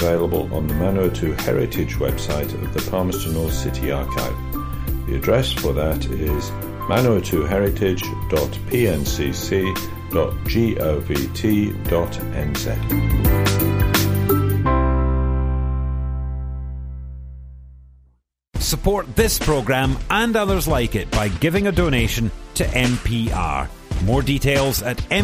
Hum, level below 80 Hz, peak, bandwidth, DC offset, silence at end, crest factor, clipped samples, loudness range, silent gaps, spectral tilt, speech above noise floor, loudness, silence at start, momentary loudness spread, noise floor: none; -26 dBFS; -4 dBFS; 15.5 kHz; under 0.1%; 0 s; 16 dB; under 0.1%; 5 LU; none; -5.5 dB/octave; 41 dB; -21 LUFS; 0 s; 8 LU; -60 dBFS